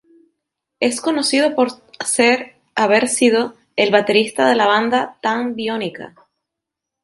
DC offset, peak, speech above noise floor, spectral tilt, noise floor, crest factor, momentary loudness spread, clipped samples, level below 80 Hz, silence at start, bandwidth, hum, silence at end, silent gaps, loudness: under 0.1%; 0 dBFS; 66 dB; -2.5 dB/octave; -83 dBFS; 18 dB; 9 LU; under 0.1%; -66 dBFS; 0.8 s; 11.5 kHz; none; 0.95 s; none; -17 LUFS